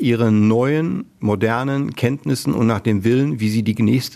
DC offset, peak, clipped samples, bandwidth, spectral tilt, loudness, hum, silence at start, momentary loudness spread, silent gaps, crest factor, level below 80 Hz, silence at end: under 0.1%; -2 dBFS; under 0.1%; 14 kHz; -7 dB/octave; -18 LUFS; none; 0 s; 6 LU; none; 16 dB; -54 dBFS; 0 s